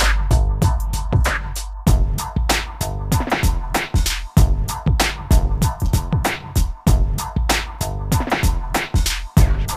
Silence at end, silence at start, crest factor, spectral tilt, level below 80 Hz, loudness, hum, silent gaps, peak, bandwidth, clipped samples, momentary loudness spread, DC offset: 0 s; 0 s; 16 dB; -4.5 dB/octave; -20 dBFS; -20 LUFS; none; none; 0 dBFS; 15.5 kHz; under 0.1%; 5 LU; under 0.1%